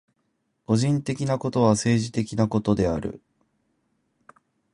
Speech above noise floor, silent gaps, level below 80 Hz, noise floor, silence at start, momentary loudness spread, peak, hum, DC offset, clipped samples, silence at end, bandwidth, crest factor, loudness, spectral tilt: 51 dB; none; -48 dBFS; -73 dBFS; 0.7 s; 6 LU; -6 dBFS; none; under 0.1%; under 0.1%; 1.55 s; 11.5 kHz; 18 dB; -24 LUFS; -6.5 dB/octave